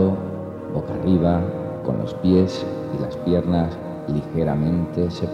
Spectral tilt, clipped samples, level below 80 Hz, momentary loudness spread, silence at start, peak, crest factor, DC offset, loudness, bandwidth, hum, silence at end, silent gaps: -9 dB/octave; under 0.1%; -42 dBFS; 9 LU; 0 s; -4 dBFS; 16 dB; under 0.1%; -22 LUFS; 7.6 kHz; none; 0 s; none